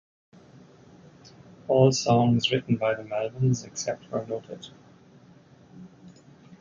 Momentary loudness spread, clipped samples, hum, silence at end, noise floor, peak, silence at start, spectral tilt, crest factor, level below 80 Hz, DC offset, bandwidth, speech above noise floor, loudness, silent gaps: 22 LU; under 0.1%; none; 0.05 s; -54 dBFS; -6 dBFS; 1.7 s; -5.5 dB/octave; 20 dB; -60 dBFS; under 0.1%; 7.6 kHz; 29 dB; -25 LUFS; none